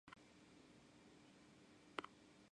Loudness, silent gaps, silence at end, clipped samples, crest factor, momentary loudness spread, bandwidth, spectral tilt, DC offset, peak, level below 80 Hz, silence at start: -60 LUFS; none; 0 s; under 0.1%; 36 dB; 13 LU; 11 kHz; -4 dB/octave; under 0.1%; -26 dBFS; -86 dBFS; 0.05 s